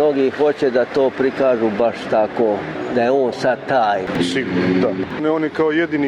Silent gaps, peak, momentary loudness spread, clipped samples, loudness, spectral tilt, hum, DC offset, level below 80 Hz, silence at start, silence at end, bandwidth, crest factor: none; -6 dBFS; 3 LU; under 0.1%; -18 LUFS; -6.5 dB/octave; none; under 0.1%; -54 dBFS; 0 s; 0 s; 11 kHz; 10 dB